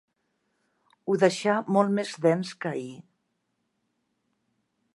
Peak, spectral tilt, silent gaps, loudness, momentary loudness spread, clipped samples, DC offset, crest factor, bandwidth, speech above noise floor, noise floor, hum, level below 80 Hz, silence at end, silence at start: -8 dBFS; -6 dB/octave; none; -26 LUFS; 13 LU; under 0.1%; under 0.1%; 22 dB; 11.5 kHz; 52 dB; -77 dBFS; none; -80 dBFS; 1.95 s; 1.05 s